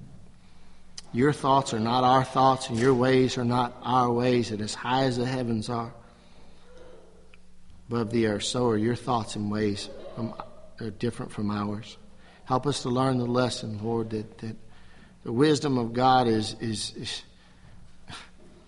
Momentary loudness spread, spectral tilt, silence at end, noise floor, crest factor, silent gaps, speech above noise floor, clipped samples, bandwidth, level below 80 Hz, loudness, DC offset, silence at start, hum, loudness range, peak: 17 LU; -5.5 dB/octave; 0.15 s; -50 dBFS; 20 dB; none; 24 dB; under 0.1%; 11.5 kHz; -52 dBFS; -26 LUFS; under 0.1%; 0 s; none; 8 LU; -8 dBFS